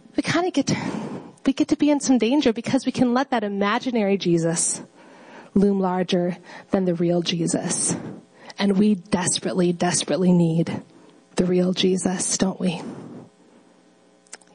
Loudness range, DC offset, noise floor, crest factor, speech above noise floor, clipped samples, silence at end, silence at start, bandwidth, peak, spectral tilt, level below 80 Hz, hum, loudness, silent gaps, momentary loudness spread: 2 LU; under 0.1%; -56 dBFS; 16 dB; 35 dB; under 0.1%; 1.3 s; 0.15 s; 10.5 kHz; -6 dBFS; -4.5 dB/octave; -58 dBFS; none; -22 LUFS; none; 11 LU